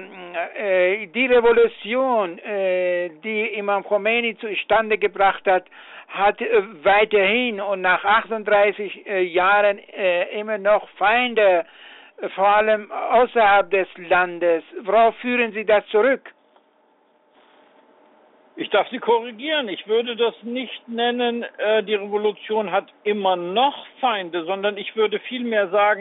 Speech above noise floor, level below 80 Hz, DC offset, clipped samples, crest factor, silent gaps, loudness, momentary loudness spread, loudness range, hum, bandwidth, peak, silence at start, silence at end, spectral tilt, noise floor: 40 dB; -60 dBFS; under 0.1%; under 0.1%; 14 dB; none; -20 LUFS; 9 LU; 5 LU; none; 4.1 kHz; -6 dBFS; 0 s; 0 s; -1 dB/octave; -60 dBFS